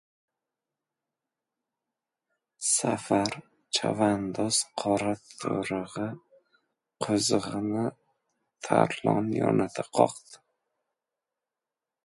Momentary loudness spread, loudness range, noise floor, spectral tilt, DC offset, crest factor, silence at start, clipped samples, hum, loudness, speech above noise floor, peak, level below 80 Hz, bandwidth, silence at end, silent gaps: 10 LU; 4 LU; -89 dBFS; -4 dB/octave; under 0.1%; 26 dB; 2.6 s; under 0.1%; none; -28 LUFS; 62 dB; -4 dBFS; -66 dBFS; 11.5 kHz; 1.7 s; none